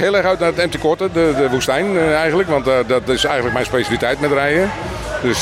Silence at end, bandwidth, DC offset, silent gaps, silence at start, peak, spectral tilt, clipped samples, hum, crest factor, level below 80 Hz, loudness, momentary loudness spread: 0 s; 16 kHz; under 0.1%; none; 0 s; -2 dBFS; -4.5 dB/octave; under 0.1%; none; 14 dB; -38 dBFS; -16 LUFS; 3 LU